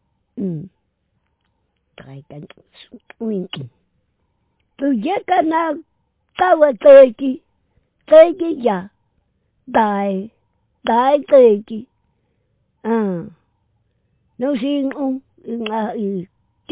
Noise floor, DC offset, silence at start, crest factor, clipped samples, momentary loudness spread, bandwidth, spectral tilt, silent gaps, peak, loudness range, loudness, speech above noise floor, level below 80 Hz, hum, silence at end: -68 dBFS; under 0.1%; 0.35 s; 18 dB; under 0.1%; 22 LU; 4 kHz; -10 dB/octave; none; 0 dBFS; 19 LU; -16 LUFS; 53 dB; -62 dBFS; none; 0.5 s